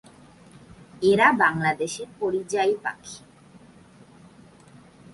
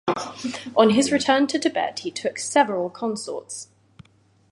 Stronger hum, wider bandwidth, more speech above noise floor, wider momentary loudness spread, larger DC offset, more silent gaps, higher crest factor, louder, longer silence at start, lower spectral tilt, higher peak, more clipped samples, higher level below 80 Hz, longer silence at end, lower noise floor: neither; about the same, 11.5 kHz vs 11.5 kHz; second, 28 dB vs 37 dB; first, 19 LU vs 14 LU; neither; neither; about the same, 22 dB vs 20 dB; about the same, -23 LUFS vs -22 LUFS; first, 1 s vs 0.05 s; about the same, -4.5 dB/octave vs -3.5 dB/octave; about the same, -4 dBFS vs -2 dBFS; neither; about the same, -62 dBFS vs -64 dBFS; first, 1.95 s vs 0.9 s; second, -51 dBFS vs -59 dBFS